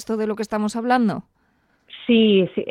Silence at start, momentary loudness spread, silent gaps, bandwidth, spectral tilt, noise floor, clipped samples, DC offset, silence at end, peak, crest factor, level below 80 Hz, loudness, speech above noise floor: 0 s; 10 LU; none; 11 kHz; -6 dB/octave; -64 dBFS; under 0.1%; under 0.1%; 0 s; -4 dBFS; 16 dB; -60 dBFS; -20 LUFS; 44 dB